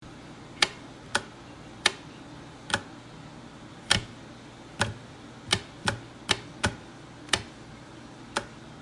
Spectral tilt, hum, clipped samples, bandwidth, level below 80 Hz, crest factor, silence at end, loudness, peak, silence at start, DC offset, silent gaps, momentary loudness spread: -2 dB/octave; none; under 0.1%; 11.5 kHz; -54 dBFS; 32 dB; 0 s; -29 LUFS; -2 dBFS; 0 s; under 0.1%; none; 19 LU